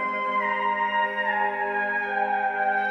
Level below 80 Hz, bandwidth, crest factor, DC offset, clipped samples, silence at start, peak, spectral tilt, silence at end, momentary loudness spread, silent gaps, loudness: -70 dBFS; 6.6 kHz; 12 dB; under 0.1%; under 0.1%; 0 s; -12 dBFS; -5 dB/octave; 0 s; 1 LU; none; -25 LUFS